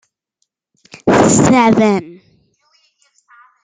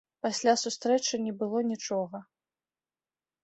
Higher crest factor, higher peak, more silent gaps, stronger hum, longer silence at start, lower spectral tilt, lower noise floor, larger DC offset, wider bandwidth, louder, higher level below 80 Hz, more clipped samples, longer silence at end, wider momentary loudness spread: second, 14 dB vs 20 dB; first, 0 dBFS vs -12 dBFS; neither; neither; first, 1.05 s vs 0.25 s; first, -5 dB/octave vs -3 dB/octave; second, -70 dBFS vs under -90 dBFS; neither; first, 9.6 kHz vs 8.4 kHz; first, -12 LUFS vs -29 LUFS; first, -48 dBFS vs -78 dBFS; neither; first, 1.5 s vs 1.2 s; first, 10 LU vs 7 LU